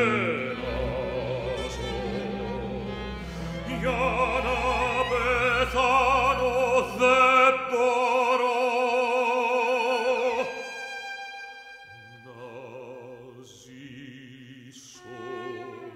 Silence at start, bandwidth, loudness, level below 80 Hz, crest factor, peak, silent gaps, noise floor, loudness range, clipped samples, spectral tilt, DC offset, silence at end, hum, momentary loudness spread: 0 s; 14 kHz; -25 LUFS; -44 dBFS; 20 dB; -6 dBFS; none; -47 dBFS; 21 LU; under 0.1%; -4.5 dB/octave; under 0.1%; 0 s; none; 22 LU